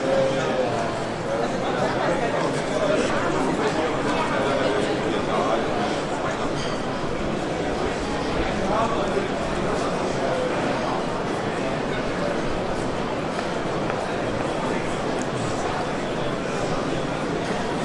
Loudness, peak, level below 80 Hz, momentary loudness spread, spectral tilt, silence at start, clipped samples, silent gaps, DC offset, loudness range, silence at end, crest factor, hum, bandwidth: -24 LUFS; -8 dBFS; -42 dBFS; 4 LU; -5 dB/octave; 0 s; under 0.1%; none; under 0.1%; 3 LU; 0 s; 16 dB; none; 11.5 kHz